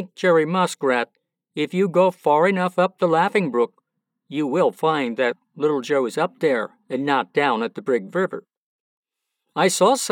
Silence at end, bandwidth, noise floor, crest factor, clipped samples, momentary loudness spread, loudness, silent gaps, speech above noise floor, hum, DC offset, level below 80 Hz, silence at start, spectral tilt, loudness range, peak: 0 s; 17.5 kHz; -78 dBFS; 16 dB; under 0.1%; 9 LU; -21 LUFS; 8.57-9.03 s; 58 dB; none; under 0.1%; under -90 dBFS; 0 s; -4.5 dB/octave; 3 LU; -6 dBFS